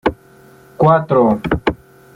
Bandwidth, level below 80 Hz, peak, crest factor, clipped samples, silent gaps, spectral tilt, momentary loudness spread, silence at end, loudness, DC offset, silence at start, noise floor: 11 kHz; -38 dBFS; -2 dBFS; 14 dB; under 0.1%; none; -8.5 dB/octave; 10 LU; 0.4 s; -15 LUFS; under 0.1%; 0.05 s; -45 dBFS